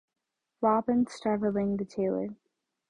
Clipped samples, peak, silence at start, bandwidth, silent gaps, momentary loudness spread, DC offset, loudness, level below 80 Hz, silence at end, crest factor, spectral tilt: under 0.1%; -12 dBFS; 0.6 s; 10.5 kHz; none; 5 LU; under 0.1%; -29 LUFS; -64 dBFS; 0.55 s; 18 dB; -7.5 dB/octave